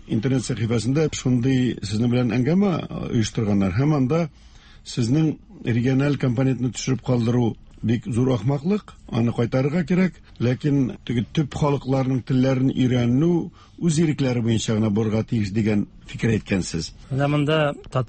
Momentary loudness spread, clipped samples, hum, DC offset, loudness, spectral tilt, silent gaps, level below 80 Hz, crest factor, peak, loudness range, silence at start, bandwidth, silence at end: 6 LU; under 0.1%; none; under 0.1%; -22 LUFS; -7 dB/octave; none; -46 dBFS; 14 dB; -8 dBFS; 2 LU; 0.05 s; 8.8 kHz; 0 s